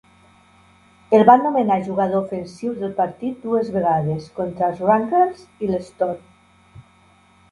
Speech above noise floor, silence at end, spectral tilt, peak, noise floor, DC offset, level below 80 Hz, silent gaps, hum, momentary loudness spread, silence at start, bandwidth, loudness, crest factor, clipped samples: 35 dB; 0.7 s; -8 dB/octave; 0 dBFS; -54 dBFS; under 0.1%; -58 dBFS; none; none; 14 LU; 1.1 s; 11 kHz; -20 LUFS; 20 dB; under 0.1%